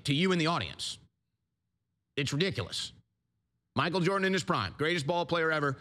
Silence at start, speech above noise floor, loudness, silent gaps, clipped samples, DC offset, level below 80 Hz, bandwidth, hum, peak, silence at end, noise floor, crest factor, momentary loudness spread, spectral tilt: 0.05 s; 53 dB; -30 LUFS; none; under 0.1%; under 0.1%; -66 dBFS; 14 kHz; none; -14 dBFS; 0 s; -83 dBFS; 18 dB; 10 LU; -5 dB/octave